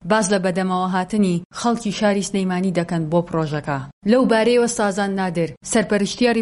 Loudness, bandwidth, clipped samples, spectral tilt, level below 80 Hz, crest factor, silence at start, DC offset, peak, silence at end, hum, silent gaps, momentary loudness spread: -20 LUFS; 11.5 kHz; under 0.1%; -5 dB/octave; -52 dBFS; 16 dB; 0 s; under 0.1%; -4 dBFS; 0 s; none; 1.45-1.50 s, 3.93-4.02 s, 5.57-5.61 s; 7 LU